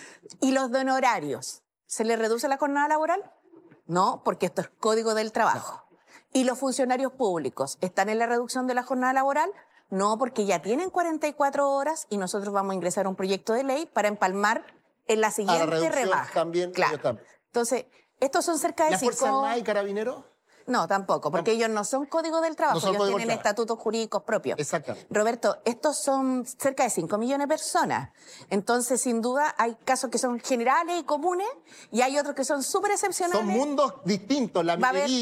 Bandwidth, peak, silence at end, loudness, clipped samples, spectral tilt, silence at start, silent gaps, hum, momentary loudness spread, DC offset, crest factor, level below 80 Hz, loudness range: 16 kHz; -10 dBFS; 0 s; -26 LUFS; under 0.1%; -3.5 dB/octave; 0 s; none; none; 6 LU; under 0.1%; 18 dB; -76 dBFS; 1 LU